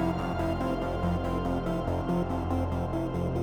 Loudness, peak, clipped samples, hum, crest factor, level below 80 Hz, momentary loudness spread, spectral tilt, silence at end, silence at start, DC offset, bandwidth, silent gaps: -30 LUFS; -16 dBFS; under 0.1%; none; 12 dB; -40 dBFS; 1 LU; -8 dB/octave; 0 s; 0 s; under 0.1%; 17.5 kHz; none